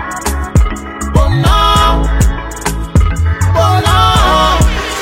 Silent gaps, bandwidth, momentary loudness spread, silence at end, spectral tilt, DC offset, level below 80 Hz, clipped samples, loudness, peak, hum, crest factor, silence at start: none; 16.5 kHz; 9 LU; 0 s; -5 dB/octave; under 0.1%; -14 dBFS; under 0.1%; -11 LUFS; 0 dBFS; none; 10 dB; 0 s